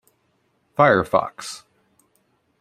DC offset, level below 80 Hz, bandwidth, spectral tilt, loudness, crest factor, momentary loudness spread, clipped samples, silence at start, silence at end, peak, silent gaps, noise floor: under 0.1%; -58 dBFS; 14.5 kHz; -5.5 dB/octave; -19 LUFS; 22 dB; 18 LU; under 0.1%; 0.8 s; 1.05 s; -2 dBFS; none; -67 dBFS